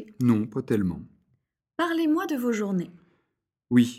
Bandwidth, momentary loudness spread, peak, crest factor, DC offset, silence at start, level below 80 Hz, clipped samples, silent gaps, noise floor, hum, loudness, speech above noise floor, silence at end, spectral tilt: 15.5 kHz; 11 LU; -8 dBFS; 18 dB; under 0.1%; 0 s; -60 dBFS; under 0.1%; none; -80 dBFS; none; -26 LUFS; 55 dB; 0 s; -7 dB/octave